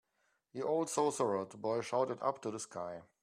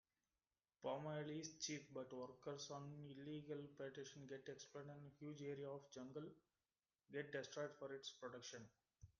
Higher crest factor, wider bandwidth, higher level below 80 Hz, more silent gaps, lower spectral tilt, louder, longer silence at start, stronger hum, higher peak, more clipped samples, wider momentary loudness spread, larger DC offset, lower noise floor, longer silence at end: about the same, 18 dB vs 20 dB; first, 14 kHz vs 10 kHz; about the same, -82 dBFS vs -86 dBFS; neither; about the same, -4.5 dB/octave vs -4.5 dB/octave; first, -37 LUFS vs -54 LUFS; second, 0.55 s vs 0.8 s; neither; first, -20 dBFS vs -34 dBFS; neither; about the same, 10 LU vs 8 LU; neither; second, -79 dBFS vs under -90 dBFS; about the same, 0.2 s vs 0.1 s